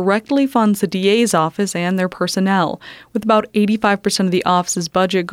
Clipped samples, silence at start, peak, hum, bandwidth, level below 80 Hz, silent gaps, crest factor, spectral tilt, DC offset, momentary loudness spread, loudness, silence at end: under 0.1%; 0 s; -2 dBFS; none; 16 kHz; -56 dBFS; none; 14 dB; -4.5 dB/octave; under 0.1%; 4 LU; -17 LUFS; 0 s